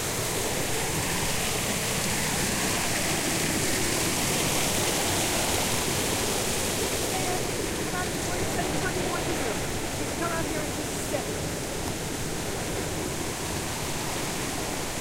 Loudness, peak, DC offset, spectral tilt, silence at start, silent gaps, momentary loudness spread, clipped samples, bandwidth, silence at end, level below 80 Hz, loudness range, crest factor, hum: -27 LUFS; -12 dBFS; under 0.1%; -3 dB/octave; 0 s; none; 6 LU; under 0.1%; 16 kHz; 0 s; -42 dBFS; 5 LU; 16 dB; none